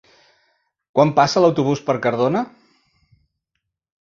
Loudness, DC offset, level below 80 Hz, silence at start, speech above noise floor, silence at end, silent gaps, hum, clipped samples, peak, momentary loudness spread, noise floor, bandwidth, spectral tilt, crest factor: -18 LUFS; under 0.1%; -60 dBFS; 0.95 s; 61 dB; 1.55 s; none; none; under 0.1%; -2 dBFS; 9 LU; -78 dBFS; 7.4 kHz; -6 dB/octave; 20 dB